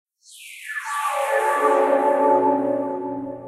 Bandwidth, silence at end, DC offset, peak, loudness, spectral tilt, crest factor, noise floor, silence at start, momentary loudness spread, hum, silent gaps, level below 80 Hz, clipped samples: 14 kHz; 0 s; under 0.1%; -6 dBFS; -21 LUFS; -4 dB/octave; 16 dB; -44 dBFS; 0.3 s; 12 LU; none; none; -70 dBFS; under 0.1%